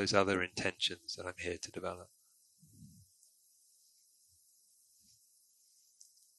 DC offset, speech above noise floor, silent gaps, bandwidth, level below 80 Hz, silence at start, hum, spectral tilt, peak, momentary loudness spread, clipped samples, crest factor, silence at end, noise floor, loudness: under 0.1%; 33 dB; none; 12 kHz; -66 dBFS; 0 s; none; -3 dB/octave; -12 dBFS; 28 LU; under 0.1%; 30 dB; 3.5 s; -70 dBFS; -37 LUFS